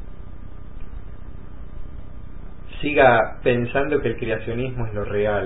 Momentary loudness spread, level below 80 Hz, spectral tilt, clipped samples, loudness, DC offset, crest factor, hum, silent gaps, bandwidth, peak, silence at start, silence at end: 25 LU; -38 dBFS; -11 dB/octave; under 0.1%; -21 LUFS; 3%; 22 dB; none; none; 4 kHz; -2 dBFS; 0 s; 0 s